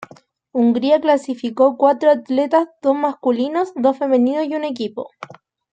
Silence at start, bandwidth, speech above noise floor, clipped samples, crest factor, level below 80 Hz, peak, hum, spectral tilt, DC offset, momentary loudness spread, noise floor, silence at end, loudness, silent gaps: 0 s; 8.8 kHz; 30 dB; under 0.1%; 16 dB; -68 dBFS; -2 dBFS; none; -6 dB/octave; under 0.1%; 12 LU; -47 dBFS; 0.4 s; -18 LUFS; none